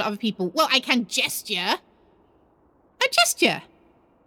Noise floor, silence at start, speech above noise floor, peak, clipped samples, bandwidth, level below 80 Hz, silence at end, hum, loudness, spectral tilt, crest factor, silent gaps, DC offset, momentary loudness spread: -60 dBFS; 0 s; 37 dB; -4 dBFS; under 0.1%; over 20 kHz; -70 dBFS; 0.65 s; none; -22 LUFS; -2 dB/octave; 22 dB; none; under 0.1%; 8 LU